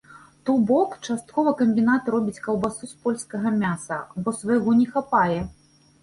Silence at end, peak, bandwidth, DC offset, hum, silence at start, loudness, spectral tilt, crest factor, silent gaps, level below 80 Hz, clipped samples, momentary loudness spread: 0.5 s; -6 dBFS; 11.5 kHz; under 0.1%; none; 0.1 s; -23 LUFS; -6.5 dB/octave; 16 dB; none; -54 dBFS; under 0.1%; 10 LU